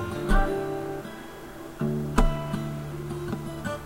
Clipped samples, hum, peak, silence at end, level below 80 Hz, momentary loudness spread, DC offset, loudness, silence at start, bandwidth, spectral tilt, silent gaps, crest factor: under 0.1%; none; -2 dBFS; 0 s; -30 dBFS; 14 LU; under 0.1%; -30 LUFS; 0 s; 16 kHz; -6.5 dB/octave; none; 24 dB